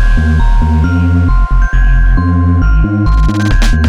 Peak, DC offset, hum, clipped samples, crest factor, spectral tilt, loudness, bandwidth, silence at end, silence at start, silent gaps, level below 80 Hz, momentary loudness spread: -2 dBFS; under 0.1%; none; under 0.1%; 6 dB; -7 dB/octave; -11 LUFS; 8 kHz; 0 s; 0 s; none; -10 dBFS; 1 LU